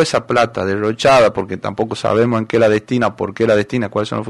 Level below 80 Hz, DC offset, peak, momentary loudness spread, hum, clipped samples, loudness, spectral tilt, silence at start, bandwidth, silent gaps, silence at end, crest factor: -50 dBFS; under 0.1%; -4 dBFS; 8 LU; none; under 0.1%; -16 LUFS; -5.5 dB/octave; 0 s; 11.5 kHz; none; 0 s; 12 dB